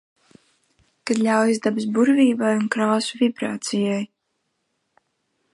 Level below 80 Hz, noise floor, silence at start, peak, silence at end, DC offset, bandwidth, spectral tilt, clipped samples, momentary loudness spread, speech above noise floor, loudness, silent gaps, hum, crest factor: -72 dBFS; -74 dBFS; 1.05 s; -6 dBFS; 1.5 s; under 0.1%; 11.5 kHz; -5 dB/octave; under 0.1%; 9 LU; 54 dB; -21 LUFS; none; none; 18 dB